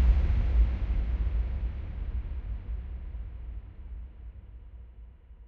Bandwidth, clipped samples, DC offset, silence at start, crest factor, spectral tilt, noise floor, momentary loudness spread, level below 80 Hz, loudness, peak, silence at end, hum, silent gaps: 4.1 kHz; under 0.1%; under 0.1%; 0 s; 18 dB; -9 dB/octave; -49 dBFS; 22 LU; -30 dBFS; -33 LUFS; -12 dBFS; 0 s; none; none